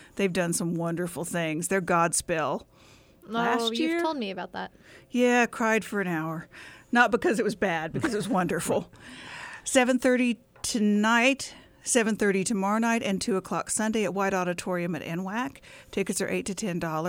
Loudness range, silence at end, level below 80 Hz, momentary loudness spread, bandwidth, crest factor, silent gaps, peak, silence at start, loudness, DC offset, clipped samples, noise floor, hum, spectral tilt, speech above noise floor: 4 LU; 0 s; -60 dBFS; 13 LU; 17.5 kHz; 18 dB; none; -8 dBFS; 0 s; -27 LUFS; under 0.1%; under 0.1%; -55 dBFS; none; -4 dB/octave; 29 dB